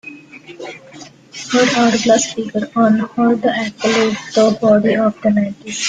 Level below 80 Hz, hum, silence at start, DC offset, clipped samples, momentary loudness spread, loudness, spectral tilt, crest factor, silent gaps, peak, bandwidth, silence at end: -56 dBFS; none; 0.05 s; under 0.1%; under 0.1%; 19 LU; -15 LUFS; -4 dB/octave; 14 dB; none; 0 dBFS; 9.6 kHz; 0 s